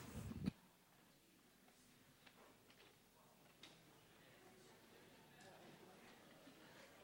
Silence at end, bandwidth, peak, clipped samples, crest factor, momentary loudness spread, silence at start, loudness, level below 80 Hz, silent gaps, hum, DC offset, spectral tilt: 0 s; 16.5 kHz; -30 dBFS; under 0.1%; 30 dB; 18 LU; 0 s; -60 LUFS; -72 dBFS; none; none; under 0.1%; -5.5 dB/octave